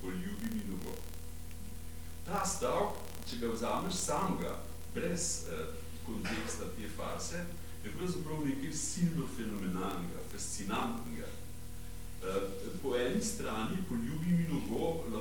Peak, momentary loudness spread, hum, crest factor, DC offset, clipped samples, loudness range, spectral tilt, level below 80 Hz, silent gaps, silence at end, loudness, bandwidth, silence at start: -20 dBFS; 14 LU; none; 16 dB; 0.8%; under 0.1%; 4 LU; -4.5 dB/octave; -50 dBFS; none; 0 s; -37 LUFS; 19 kHz; 0 s